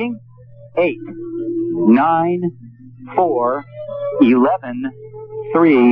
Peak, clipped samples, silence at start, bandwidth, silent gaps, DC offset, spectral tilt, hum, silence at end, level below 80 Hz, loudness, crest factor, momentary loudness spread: 0 dBFS; under 0.1%; 0 s; 4.8 kHz; none; under 0.1%; -10.5 dB/octave; none; 0 s; -60 dBFS; -17 LUFS; 16 dB; 17 LU